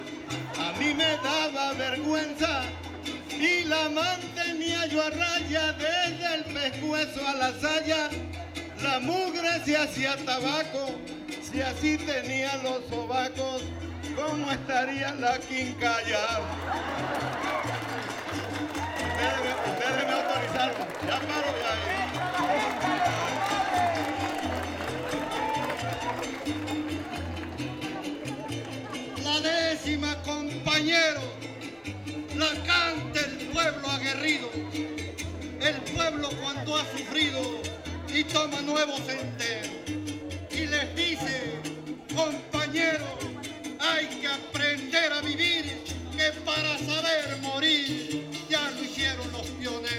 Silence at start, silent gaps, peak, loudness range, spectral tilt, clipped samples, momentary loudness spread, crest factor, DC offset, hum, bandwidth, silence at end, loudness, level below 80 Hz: 0 s; none; -10 dBFS; 4 LU; -3.5 dB/octave; under 0.1%; 10 LU; 20 dB; under 0.1%; none; 16.5 kHz; 0 s; -28 LUFS; -52 dBFS